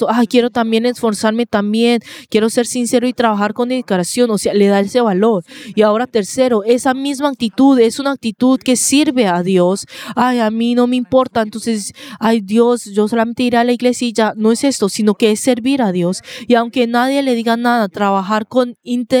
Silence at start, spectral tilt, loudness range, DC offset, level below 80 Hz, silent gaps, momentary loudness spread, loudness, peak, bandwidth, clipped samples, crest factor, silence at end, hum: 0 s; -4.5 dB/octave; 2 LU; under 0.1%; -58 dBFS; none; 6 LU; -15 LUFS; 0 dBFS; 17 kHz; under 0.1%; 14 dB; 0 s; none